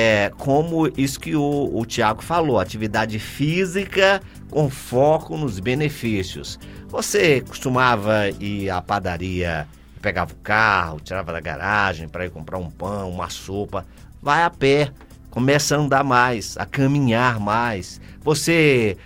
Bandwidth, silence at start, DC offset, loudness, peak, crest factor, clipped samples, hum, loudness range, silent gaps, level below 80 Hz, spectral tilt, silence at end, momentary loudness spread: 16.5 kHz; 0 s; under 0.1%; -21 LUFS; -2 dBFS; 20 dB; under 0.1%; none; 4 LU; none; -44 dBFS; -5 dB/octave; 0.05 s; 12 LU